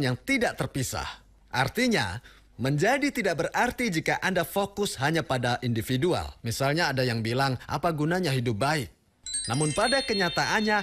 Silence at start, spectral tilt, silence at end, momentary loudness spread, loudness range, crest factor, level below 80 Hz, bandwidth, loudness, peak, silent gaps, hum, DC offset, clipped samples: 0 s; -4.5 dB/octave; 0 s; 7 LU; 1 LU; 16 dB; -52 dBFS; 16 kHz; -27 LUFS; -10 dBFS; none; none; under 0.1%; under 0.1%